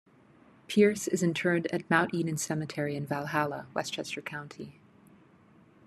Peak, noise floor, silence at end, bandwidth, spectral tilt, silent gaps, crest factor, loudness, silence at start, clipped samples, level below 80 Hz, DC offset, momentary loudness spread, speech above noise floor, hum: -10 dBFS; -59 dBFS; 1.15 s; 13.5 kHz; -5 dB/octave; none; 22 dB; -30 LUFS; 0.7 s; under 0.1%; -72 dBFS; under 0.1%; 14 LU; 30 dB; none